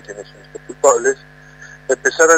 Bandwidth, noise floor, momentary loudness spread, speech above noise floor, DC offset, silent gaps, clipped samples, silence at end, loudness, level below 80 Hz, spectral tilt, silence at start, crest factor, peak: 16.5 kHz; -40 dBFS; 23 LU; 24 dB; under 0.1%; none; under 0.1%; 0 s; -16 LUFS; -54 dBFS; -1.5 dB/octave; 0.1 s; 18 dB; 0 dBFS